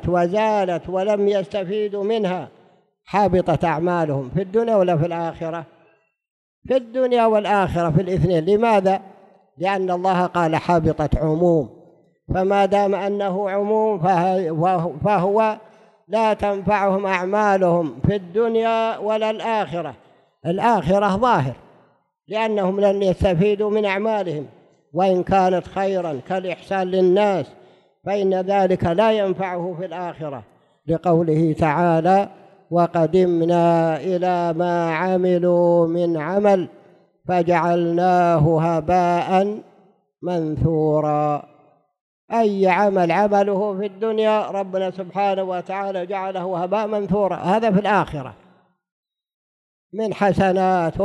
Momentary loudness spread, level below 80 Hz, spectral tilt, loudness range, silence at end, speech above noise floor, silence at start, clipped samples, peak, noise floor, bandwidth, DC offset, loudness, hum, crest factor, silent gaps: 9 LU; -44 dBFS; -7.5 dB/octave; 3 LU; 0 s; 40 dB; 0 s; under 0.1%; -4 dBFS; -59 dBFS; 10.5 kHz; under 0.1%; -20 LUFS; none; 14 dB; 6.30-6.62 s, 42.01-42.28 s, 48.91-49.03 s, 49.34-49.90 s